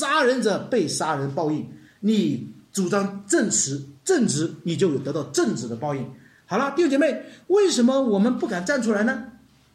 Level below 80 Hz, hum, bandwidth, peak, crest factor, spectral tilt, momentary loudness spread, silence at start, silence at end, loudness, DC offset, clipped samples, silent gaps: -66 dBFS; none; 14 kHz; -8 dBFS; 16 dB; -4.5 dB/octave; 10 LU; 0 s; 0.45 s; -23 LUFS; under 0.1%; under 0.1%; none